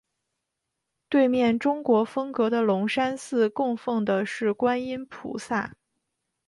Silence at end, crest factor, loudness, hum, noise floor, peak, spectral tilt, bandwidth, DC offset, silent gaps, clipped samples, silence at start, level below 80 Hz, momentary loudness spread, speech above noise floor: 0.8 s; 16 dB; -25 LUFS; none; -82 dBFS; -10 dBFS; -6 dB/octave; 11.5 kHz; under 0.1%; none; under 0.1%; 1.1 s; -66 dBFS; 8 LU; 58 dB